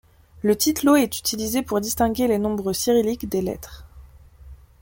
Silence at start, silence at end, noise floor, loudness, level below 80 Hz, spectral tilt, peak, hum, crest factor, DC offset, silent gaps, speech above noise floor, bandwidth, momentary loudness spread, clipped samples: 0.35 s; 0.25 s; -46 dBFS; -21 LUFS; -46 dBFS; -4 dB/octave; -6 dBFS; none; 16 dB; under 0.1%; none; 25 dB; 17 kHz; 8 LU; under 0.1%